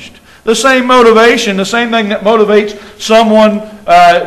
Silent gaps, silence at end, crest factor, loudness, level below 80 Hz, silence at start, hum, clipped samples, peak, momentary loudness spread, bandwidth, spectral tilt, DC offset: none; 0 s; 8 dB; -8 LUFS; -42 dBFS; 0 s; none; 2%; 0 dBFS; 10 LU; 13.5 kHz; -4 dB/octave; under 0.1%